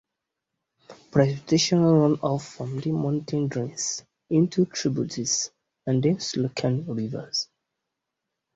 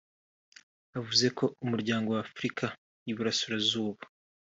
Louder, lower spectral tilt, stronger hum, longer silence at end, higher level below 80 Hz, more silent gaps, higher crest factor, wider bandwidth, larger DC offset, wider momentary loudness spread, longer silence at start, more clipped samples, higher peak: first, -25 LUFS vs -31 LUFS; about the same, -5 dB/octave vs -4 dB/octave; neither; first, 1.1 s vs 0.4 s; first, -62 dBFS vs -72 dBFS; second, none vs 2.78-3.06 s; second, 18 dB vs 24 dB; about the same, 8 kHz vs 8 kHz; neither; second, 11 LU vs 14 LU; about the same, 0.9 s vs 0.95 s; neither; first, -6 dBFS vs -10 dBFS